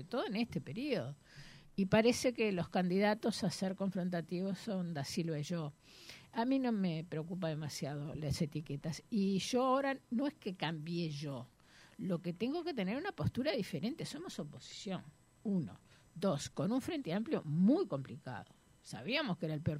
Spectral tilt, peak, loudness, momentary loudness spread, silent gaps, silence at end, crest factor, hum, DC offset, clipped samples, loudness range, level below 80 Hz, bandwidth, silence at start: -6 dB/octave; -18 dBFS; -37 LUFS; 14 LU; none; 0 s; 20 dB; none; under 0.1%; under 0.1%; 5 LU; -66 dBFS; 15 kHz; 0 s